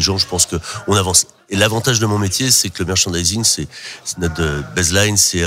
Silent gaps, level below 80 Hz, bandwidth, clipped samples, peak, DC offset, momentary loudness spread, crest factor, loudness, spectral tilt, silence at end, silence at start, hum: none; -36 dBFS; 16.5 kHz; under 0.1%; 0 dBFS; under 0.1%; 9 LU; 16 dB; -15 LUFS; -2.5 dB/octave; 0 s; 0 s; none